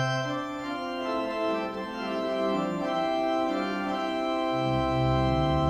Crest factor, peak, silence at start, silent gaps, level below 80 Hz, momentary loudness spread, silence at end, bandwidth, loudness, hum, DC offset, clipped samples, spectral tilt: 14 dB; -14 dBFS; 0 s; none; -44 dBFS; 7 LU; 0 s; 12.5 kHz; -28 LUFS; none; under 0.1%; under 0.1%; -6.5 dB/octave